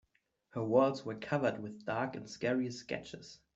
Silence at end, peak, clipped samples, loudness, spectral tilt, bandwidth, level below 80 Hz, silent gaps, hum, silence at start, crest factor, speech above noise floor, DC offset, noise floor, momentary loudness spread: 0.2 s; -16 dBFS; under 0.1%; -35 LUFS; -6 dB/octave; 8 kHz; -72 dBFS; none; none; 0.55 s; 20 dB; 41 dB; under 0.1%; -76 dBFS; 13 LU